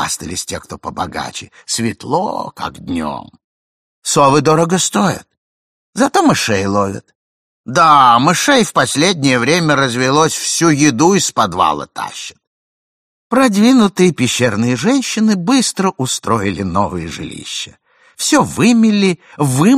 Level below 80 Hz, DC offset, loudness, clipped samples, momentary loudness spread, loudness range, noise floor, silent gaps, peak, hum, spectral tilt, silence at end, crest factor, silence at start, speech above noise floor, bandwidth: -48 dBFS; under 0.1%; -13 LUFS; under 0.1%; 14 LU; 6 LU; under -90 dBFS; 3.44-4.02 s, 5.37-5.93 s, 7.15-7.64 s, 12.47-13.30 s; 0 dBFS; none; -4 dB/octave; 0 s; 14 dB; 0 s; over 77 dB; 15.5 kHz